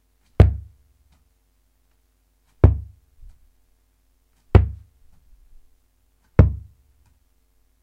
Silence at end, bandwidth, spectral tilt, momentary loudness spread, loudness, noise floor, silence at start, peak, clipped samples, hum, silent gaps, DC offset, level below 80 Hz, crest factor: 1.25 s; 4.9 kHz; -10 dB/octave; 19 LU; -19 LUFS; -64 dBFS; 0.4 s; 0 dBFS; under 0.1%; none; none; under 0.1%; -28 dBFS; 24 dB